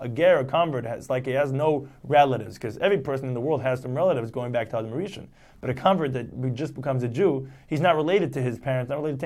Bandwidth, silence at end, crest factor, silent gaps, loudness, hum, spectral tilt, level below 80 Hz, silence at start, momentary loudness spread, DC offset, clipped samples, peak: 13.5 kHz; 0 s; 18 dB; none; -25 LUFS; none; -7 dB/octave; -58 dBFS; 0 s; 11 LU; under 0.1%; under 0.1%; -6 dBFS